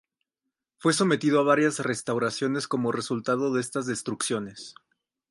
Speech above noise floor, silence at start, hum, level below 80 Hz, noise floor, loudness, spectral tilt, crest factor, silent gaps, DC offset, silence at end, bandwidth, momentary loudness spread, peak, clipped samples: 59 dB; 0.8 s; none; -70 dBFS; -85 dBFS; -26 LUFS; -4.5 dB/octave; 18 dB; none; under 0.1%; 0.6 s; 11.5 kHz; 9 LU; -8 dBFS; under 0.1%